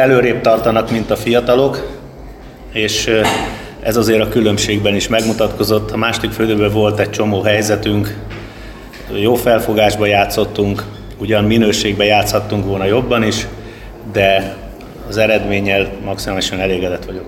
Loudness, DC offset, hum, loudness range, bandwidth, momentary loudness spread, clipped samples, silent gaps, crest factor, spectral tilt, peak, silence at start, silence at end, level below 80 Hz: -14 LUFS; under 0.1%; none; 2 LU; 17 kHz; 17 LU; under 0.1%; none; 14 dB; -5 dB/octave; 0 dBFS; 0 s; 0 s; -34 dBFS